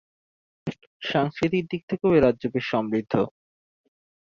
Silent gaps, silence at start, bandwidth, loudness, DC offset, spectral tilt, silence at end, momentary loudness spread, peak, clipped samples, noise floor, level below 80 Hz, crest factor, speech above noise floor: 0.87-1.00 s, 1.83-1.88 s; 0.65 s; 7.4 kHz; -24 LUFS; under 0.1%; -7.5 dB/octave; 0.95 s; 17 LU; -6 dBFS; under 0.1%; under -90 dBFS; -54 dBFS; 20 dB; over 67 dB